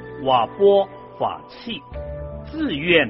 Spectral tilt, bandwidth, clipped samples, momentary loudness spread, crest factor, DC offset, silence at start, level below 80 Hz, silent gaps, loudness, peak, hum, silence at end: -3 dB/octave; 5.8 kHz; under 0.1%; 16 LU; 18 dB; under 0.1%; 0 s; -42 dBFS; none; -21 LUFS; -2 dBFS; none; 0 s